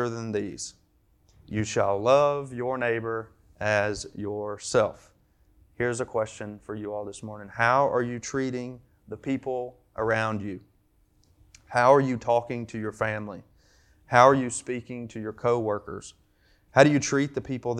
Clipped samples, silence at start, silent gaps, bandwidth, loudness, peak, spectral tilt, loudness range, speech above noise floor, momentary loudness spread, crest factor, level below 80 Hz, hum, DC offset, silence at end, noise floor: under 0.1%; 0 s; none; 11 kHz; -26 LUFS; -2 dBFS; -5 dB/octave; 7 LU; 38 dB; 18 LU; 26 dB; -60 dBFS; none; under 0.1%; 0 s; -64 dBFS